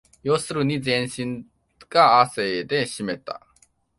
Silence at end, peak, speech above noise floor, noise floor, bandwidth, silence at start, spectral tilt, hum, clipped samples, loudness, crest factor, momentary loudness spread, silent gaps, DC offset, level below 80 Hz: 0.6 s; -2 dBFS; 39 dB; -61 dBFS; 11.5 kHz; 0.25 s; -4.5 dB/octave; none; under 0.1%; -22 LUFS; 22 dB; 16 LU; none; under 0.1%; -60 dBFS